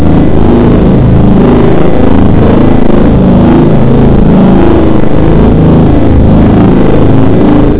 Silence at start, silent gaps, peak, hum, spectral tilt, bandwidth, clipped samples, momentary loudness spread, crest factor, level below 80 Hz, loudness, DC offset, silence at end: 0 s; none; 0 dBFS; none; -12.5 dB/octave; 4 kHz; 20%; 2 LU; 6 dB; -12 dBFS; -5 LUFS; 30%; 0 s